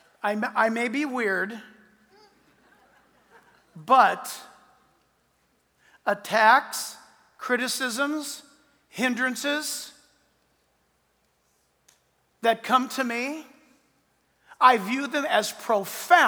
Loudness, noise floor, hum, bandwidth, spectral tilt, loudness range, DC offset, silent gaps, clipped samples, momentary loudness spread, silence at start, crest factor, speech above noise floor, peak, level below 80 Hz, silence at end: -24 LUFS; -69 dBFS; none; over 20 kHz; -2.5 dB/octave; 6 LU; under 0.1%; none; under 0.1%; 17 LU; 0.25 s; 24 dB; 46 dB; -2 dBFS; -80 dBFS; 0 s